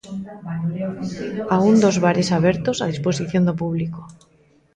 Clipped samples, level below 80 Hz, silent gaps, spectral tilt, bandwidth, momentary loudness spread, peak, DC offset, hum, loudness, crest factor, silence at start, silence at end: under 0.1%; -52 dBFS; none; -6.5 dB/octave; 9.6 kHz; 14 LU; -4 dBFS; under 0.1%; none; -20 LUFS; 16 dB; 0.05 s; 0.6 s